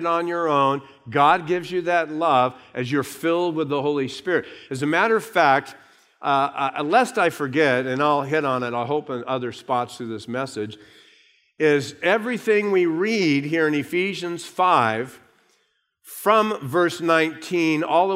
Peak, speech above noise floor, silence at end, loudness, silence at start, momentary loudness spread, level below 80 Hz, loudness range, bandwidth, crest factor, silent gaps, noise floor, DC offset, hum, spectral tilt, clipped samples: -4 dBFS; 47 dB; 0 s; -21 LUFS; 0 s; 10 LU; -72 dBFS; 4 LU; 16 kHz; 18 dB; none; -68 dBFS; under 0.1%; none; -5 dB/octave; under 0.1%